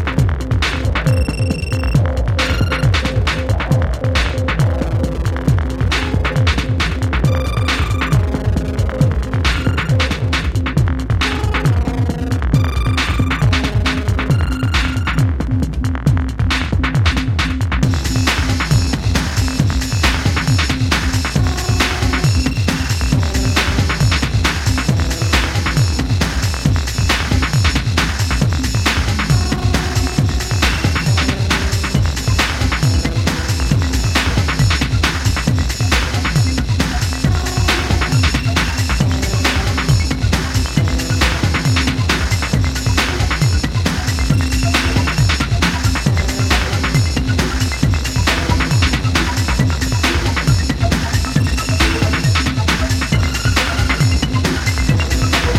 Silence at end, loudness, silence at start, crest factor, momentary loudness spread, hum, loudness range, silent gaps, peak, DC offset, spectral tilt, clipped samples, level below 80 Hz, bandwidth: 0 s; -16 LUFS; 0 s; 14 dB; 2 LU; none; 1 LU; none; 0 dBFS; under 0.1%; -5 dB/octave; under 0.1%; -20 dBFS; 16 kHz